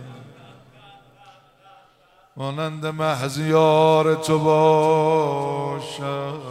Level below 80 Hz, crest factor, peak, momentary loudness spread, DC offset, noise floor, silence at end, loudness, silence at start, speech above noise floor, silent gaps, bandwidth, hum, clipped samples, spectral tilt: -64 dBFS; 16 dB; -4 dBFS; 13 LU; under 0.1%; -56 dBFS; 0 s; -20 LUFS; 0 s; 37 dB; none; 15 kHz; none; under 0.1%; -6 dB/octave